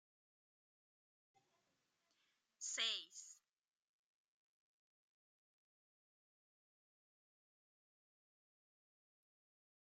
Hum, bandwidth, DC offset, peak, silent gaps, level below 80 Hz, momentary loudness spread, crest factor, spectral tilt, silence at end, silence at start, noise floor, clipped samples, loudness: none; 13 kHz; under 0.1%; -28 dBFS; none; under -90 dBFS; 17 LU; 30 dB; 3.5 dB/octave; 6.55 s; 2.6 s; -86 dBFS; under 0.1%; -43 LUFS